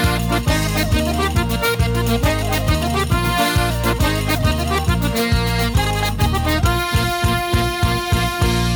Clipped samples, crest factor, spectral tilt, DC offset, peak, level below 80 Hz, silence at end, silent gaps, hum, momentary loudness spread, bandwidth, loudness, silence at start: under 0.1%; 12 dB; -5 dB/octave; under 0.1%; -4 dBFS; -24 dBFS; 0 s; none; none; 1 LU; over 20 kHz; -18 LUFS; 0 s